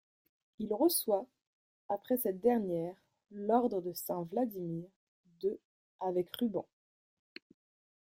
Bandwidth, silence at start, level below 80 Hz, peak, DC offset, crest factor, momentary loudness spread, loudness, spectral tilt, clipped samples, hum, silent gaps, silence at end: 16.5 kHz; 0.6 s; -76 dBFS; -16 dBFS; under 0.1%; 20 dB; 22 LU; -35 LUFS; -5 dB/octave; under 0.1%; none; 1.47-1.89 s, 4.96-5.24 s, 5.65-5.99 s; 1.4 s